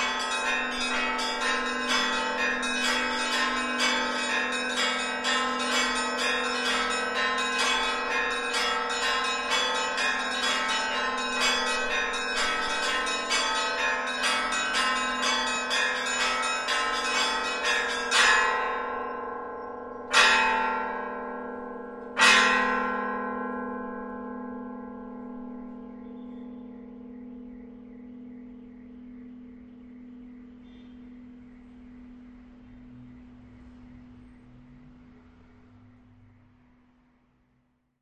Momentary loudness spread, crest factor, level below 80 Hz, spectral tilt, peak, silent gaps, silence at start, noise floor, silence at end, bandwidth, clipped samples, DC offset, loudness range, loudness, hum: 21 LU; 24 dB; -56 dBFS; -0.5 dB/octave; -4 dBFS; none; 0 s; -70 dBFS; 2.85 s; 12.5 kHz; under 0.1%; under 0.1%; 20 LU; -25 LUFS; none